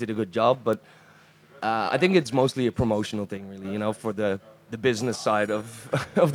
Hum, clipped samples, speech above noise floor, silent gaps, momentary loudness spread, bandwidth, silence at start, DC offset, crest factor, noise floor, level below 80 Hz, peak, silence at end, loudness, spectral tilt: none; under 0.1%; 29 dB; none; 11 LU; 16.5 kHz; 0 s; under 0.1%; 20 dB; -54 dBFS; -54 dBFS; -6 dBFS; 0 s; -26 LUFS; -6 dB/octave